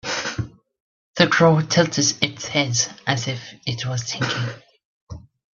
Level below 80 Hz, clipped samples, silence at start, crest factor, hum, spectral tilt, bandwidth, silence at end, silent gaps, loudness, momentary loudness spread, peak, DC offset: -54 dBFS; under 0.1%; 0.05 s; 22 dB; none; -3.5 dB/octave; 7.6 kHz; 0.35 s; 0.80-1.14 s, 4.85-5.07 s; -21 LUFS; 19 LU; 0 dBFS; under 0.1%